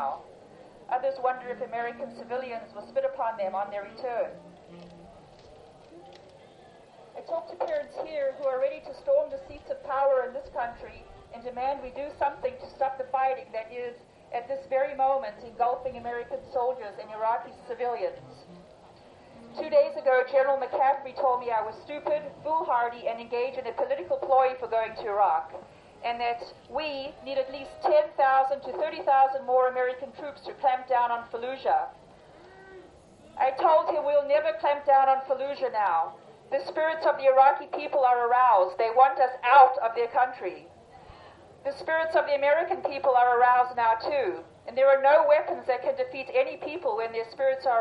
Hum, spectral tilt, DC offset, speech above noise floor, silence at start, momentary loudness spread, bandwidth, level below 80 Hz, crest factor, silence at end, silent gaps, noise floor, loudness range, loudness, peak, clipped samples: none; -5.5 dB/octave; under 0.1%; 27 dB; 0 s; 15 LU; 6 kHz; -64 dBFS; 20 dB; 0 s; none; -53 dBFS; 10 LU; -26 LUFS; -6 dBFS; under 0.1%